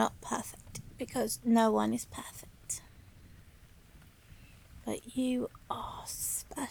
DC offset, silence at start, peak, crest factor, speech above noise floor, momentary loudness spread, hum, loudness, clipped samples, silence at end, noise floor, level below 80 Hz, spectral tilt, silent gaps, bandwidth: under 0.1%; 0 s; -14 dBFS; 22 dB; 25 dB; 18 LU; none; -34 LUFS; under 0.1%; 0 s; -57 dBFS; -58 dBFS; -4 dB/octave; none; over 20 kHz